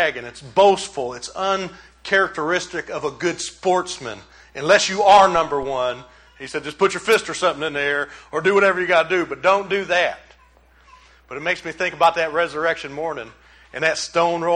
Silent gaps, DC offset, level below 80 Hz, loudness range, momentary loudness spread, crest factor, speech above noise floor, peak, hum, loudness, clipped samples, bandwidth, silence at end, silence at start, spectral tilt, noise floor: none; under 0.1%; -54 dBFS; 5 LU; 15 LU; 20 dB; 33 dB; -2 dBFS; none; -19 LUFS; under 0.1%; 14.5 kHz; 0 s; 0 s; -3 dB/octave; -53 dBFS